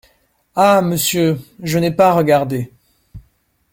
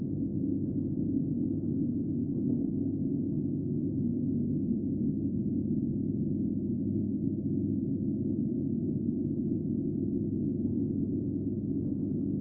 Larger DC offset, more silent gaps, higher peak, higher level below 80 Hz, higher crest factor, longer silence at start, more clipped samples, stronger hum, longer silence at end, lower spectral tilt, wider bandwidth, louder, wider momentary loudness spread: neither; neither; first, 0 dBFS vs -18 dBFS; about the same, -50 dBFS vs -54 dBFS; about the same, 16 dB vs 12 dB; first, 0.55 s vs 0 s; neither; neither; first, 0.55 s vs 0 s; second, -5 dB/octave vs -18.5 dB/octave; first, 16.5 kHz vs 1.1 kHz; first, -15 LUFS vs -32 LUFS; first, 12 LU vs 1 LU